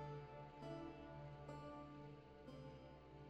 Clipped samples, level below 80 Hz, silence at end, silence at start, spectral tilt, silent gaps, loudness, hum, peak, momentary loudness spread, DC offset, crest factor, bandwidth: under 0.1%; -70 dBFS; 0 s; 0 s; -7.5 dB/octave; none; -56 LUFS; none; -42 dBFS; 6 LU; under 0.1%; 14 dB; 8.8 kHz